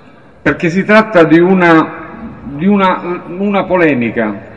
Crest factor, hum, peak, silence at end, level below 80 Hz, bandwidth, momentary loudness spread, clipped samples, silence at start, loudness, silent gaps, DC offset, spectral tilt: 12 dB; none; 0 dBFS; 0 s; -44 dBFS; 8.2 kHz; 14 LU; 0.3%; 0.45 s; -11 LUFS; none; 0.6%; -7.5 dB/octave